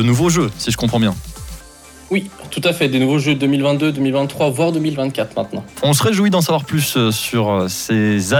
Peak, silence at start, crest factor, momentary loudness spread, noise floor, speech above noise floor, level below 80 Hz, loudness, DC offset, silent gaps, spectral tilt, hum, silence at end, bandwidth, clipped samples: -4 dBFS; 0 s; 12 dB; 8 LU; -40 dBFS; 24 dB; -42 dBFS; -17 LUFS; under 0.1%; none; -5 dB/octave; none; 0 s; 19 kHz; under 0.1%